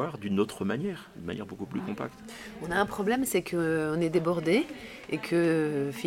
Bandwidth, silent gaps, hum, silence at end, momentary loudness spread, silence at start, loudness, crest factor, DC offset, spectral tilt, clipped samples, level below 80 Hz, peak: 16.5 kHz; none; none; 0 s; 12 LU; 0 s; -29 LUFS; 18 dB; under 0.1%; -5.5 dB/octave; under 0.1%; -60 dBFS; -12 dBFS